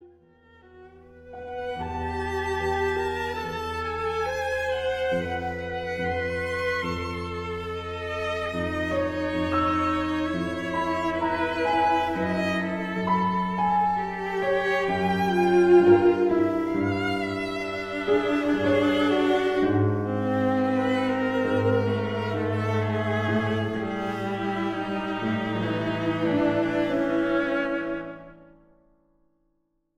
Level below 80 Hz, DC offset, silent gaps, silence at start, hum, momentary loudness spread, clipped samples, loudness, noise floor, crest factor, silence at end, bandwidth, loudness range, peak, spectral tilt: -50 dBFS; under 0.1%; none; 0 s; none; 8 LU; under 0.1%; -25 LUFS; -72 dBFS; 18 dB; 1.55 s; 12.5 kHz; 7 LU; -8 dBFS; -7 dB/octave